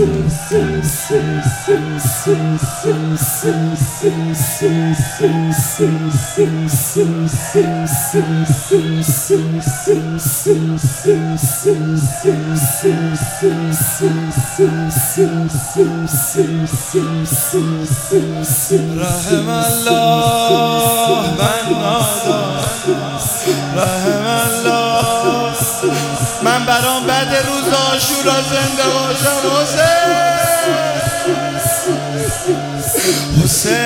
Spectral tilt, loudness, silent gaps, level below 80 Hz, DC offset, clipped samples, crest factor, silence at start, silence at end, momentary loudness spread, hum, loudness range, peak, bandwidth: -4.5 dB/octave; -15 LUFS; none; -40 dBFS; under 0.1%; under 0.1%; 14 dB; 0 s; 0 s; 5 LU; none; 2 LU; 0 dBFS; 17.5 kHz